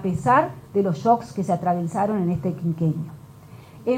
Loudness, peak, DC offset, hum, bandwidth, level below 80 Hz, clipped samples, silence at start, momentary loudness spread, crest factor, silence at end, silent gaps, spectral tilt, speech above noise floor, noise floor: -23 LUFS; -6 dBFS; under 0.1%; none; 15 kHz; -54 dBFS; under 0.1%; 0 s; 7 LU; 16 dB; 0 s; none; -8 dB/octave; 22 dB; -44 dBFS